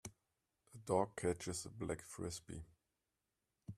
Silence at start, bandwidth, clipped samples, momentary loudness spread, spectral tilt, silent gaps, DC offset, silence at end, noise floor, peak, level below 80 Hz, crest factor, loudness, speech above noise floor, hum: 0.05 s; 14.5 kHz; under 0.1%; 20 LU; -5 dB/octave; none; under 0.1%; 0 s; -89 dBFS; -22 dBFS; -68 dBFS; 24 dB; -43 LUFS; 47 dB; none